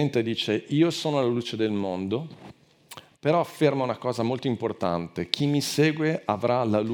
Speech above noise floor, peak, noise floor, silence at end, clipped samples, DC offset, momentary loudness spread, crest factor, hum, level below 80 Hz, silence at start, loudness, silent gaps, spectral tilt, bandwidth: 24 dB; -2 dBFS; -49 dBFS; 0 s; under 0.1%; under 0.1%; 7 LU; 24 dB; none; -68 dBFS; 0 s; -26 LUFS; none; -6 dB/octave; over 20 kHz